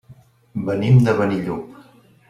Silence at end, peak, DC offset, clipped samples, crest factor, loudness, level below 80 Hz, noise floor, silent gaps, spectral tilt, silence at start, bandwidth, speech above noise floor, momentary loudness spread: 0.55 s; -4 dBFS; under 0.1%; under 0.1%; 16 dB; -18 LUFS; -52 dBFS; -48 dBFS; none; -8.5 dB/octave; 0.1 s; 7 kHz; 31 dB; 17 LU